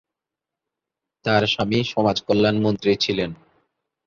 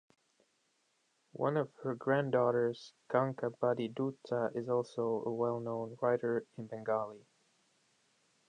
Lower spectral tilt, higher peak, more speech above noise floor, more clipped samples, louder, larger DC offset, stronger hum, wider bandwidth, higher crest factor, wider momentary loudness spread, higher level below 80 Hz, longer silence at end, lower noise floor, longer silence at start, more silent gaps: second, -5.5 dB/octave vs -8 dB/octave; first, -4 dBFS vs -14 dBFS; first, 66 dB vs 42 dB; neither; first, -21 LUFS vs -35 LUFS; neither; neither; second, 7.4 kHz vs 9.6 kHz; about the same, 20 dB vs 22 dB; about the same, 6 LU vs 8 LU; first, -52 dBFS vs -82 dBFS; second, 0.7 s vs 1.3 s; first, -86 dBFS vs -77 dBFS; about the same, 1.25 s vs 1.35 s; neither